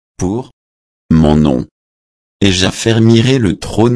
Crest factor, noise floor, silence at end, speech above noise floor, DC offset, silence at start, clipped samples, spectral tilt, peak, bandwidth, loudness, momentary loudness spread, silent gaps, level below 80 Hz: 12 dB; under -90 dBFS; 0 s; over 79 dB; under 0.1%; 0.2 s; under 0.1%; -6 dB/octave; 0 dBFS; 11 kHz; -12 LUFS; 10 LU; 0.53-1.09 s, 1.71-2.40 s; -30 dBFS